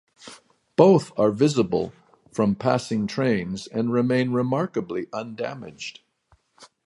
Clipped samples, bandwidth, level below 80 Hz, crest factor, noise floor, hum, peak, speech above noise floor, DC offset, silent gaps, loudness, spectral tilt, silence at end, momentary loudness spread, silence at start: under 0.1%; 11.5 kHz; -60 dBFS; 22 dB; -63 dBFS; none; -2 dBFS; 41 dB; under 0.1%; none; -23 LUFS; -6.5 dB/octave; 0.2 s; 17 LU; 0.25 s